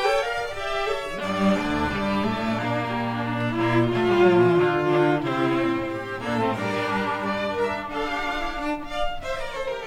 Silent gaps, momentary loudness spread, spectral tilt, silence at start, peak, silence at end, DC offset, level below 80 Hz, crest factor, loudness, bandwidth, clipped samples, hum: none; 9 LU; -6.5 dB/octave; 0 s; -6 dBFS; 0 s; under 0.1%; -44 dBFS; 18 dB; -24 LUFS; 14 kHz; under 0.1%; none